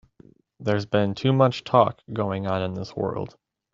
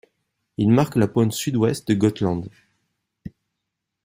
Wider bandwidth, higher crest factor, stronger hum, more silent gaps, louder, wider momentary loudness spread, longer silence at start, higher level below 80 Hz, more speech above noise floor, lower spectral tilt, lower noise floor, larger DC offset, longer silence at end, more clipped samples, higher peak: second, 7.6 kHz vs 16 kHz; about the same, 22 dB vs 18 dB; neither; neither; second, -24 LUFS vs -21 LUFS; second, 10 LU vs 23 LU; about the same, 0.6 s vs 0.6 s; second, -62 dBFS vs -56 dBFS; second, 31 dB vs 61 dB; about the same, -7.5 dB/octave vs -6.5 dB/octave; second, -54 dBFS vs -81 dBFS; neither; second, 0.45 s vs 0.75 s; neither; about the same, -2 dBFS vs -4 dBFS